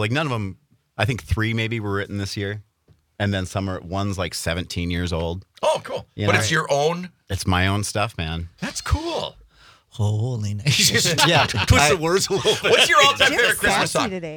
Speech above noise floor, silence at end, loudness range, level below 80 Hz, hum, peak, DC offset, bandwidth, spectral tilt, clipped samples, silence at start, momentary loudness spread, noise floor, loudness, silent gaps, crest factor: 39 dB; 0 s; 10 LU; -40 dBFS; none; -4 dBFS; under 0.1%; 19.5 kHz; -3.5 dB/octave; under 0.1%; 0 s; 13 LU; -59 dBFS; -20 LUFS; none; 18 dB